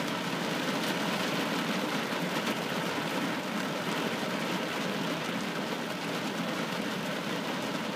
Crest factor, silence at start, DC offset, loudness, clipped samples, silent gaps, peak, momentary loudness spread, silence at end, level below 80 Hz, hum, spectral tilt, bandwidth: 16 dB; 0 s; under 0.1%; -32 LUFS; under 0.1%; none; -16 dBFS; 3 LU; 0 s; -76 dBFS; none; -4 dB/octave; 15.5 kHz